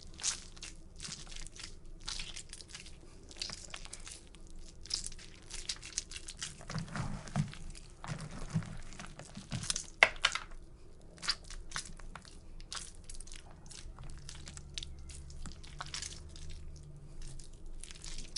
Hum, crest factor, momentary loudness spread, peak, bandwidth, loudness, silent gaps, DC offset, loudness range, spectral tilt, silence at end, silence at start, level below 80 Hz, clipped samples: none; 36 dB; 16 LU; -4 dBFS; 11.5 kHz; -40 LUFS; none; under 0.1%; 13 LU; -2.5 dB/octave; 0 s; 0 s; -50 dBFS; under 0.1%